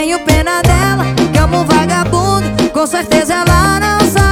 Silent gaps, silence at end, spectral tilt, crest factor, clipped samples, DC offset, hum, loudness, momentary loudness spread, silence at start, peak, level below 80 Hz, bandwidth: none; 0 s; -5 dB/octave; 10 dB; 0.2%; under 0.1%; none; -11 LUFS; 3 LU; 0 s; 0 dBFS; -20 dBFS; 18.5 kHz